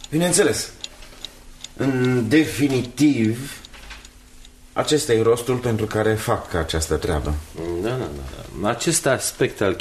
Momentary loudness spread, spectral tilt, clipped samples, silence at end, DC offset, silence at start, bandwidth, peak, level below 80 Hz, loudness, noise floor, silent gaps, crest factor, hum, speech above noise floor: 19 LU; -4.5 dB/octave; under 0.1%; 0 s; under 0.1%; 0 s; 13.5 kHz; -4 dBFS; -38 dBFS; -21 LUFS; -45 dBFS; none; 18 dB; none; 24 dB